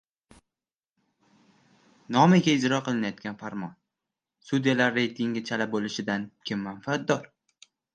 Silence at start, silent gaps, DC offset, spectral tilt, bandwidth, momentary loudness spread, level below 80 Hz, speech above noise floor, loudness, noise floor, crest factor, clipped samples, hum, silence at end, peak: 2.1 s; none; under 0.1%; -5.5 dB/octave; 9 kHz; 15 LU; -70 dBFS; over 64 dB; -26 LUFS; under -90 dBFS; 22 dB; under 0.1%; none; 0.7 s; -6 dBFS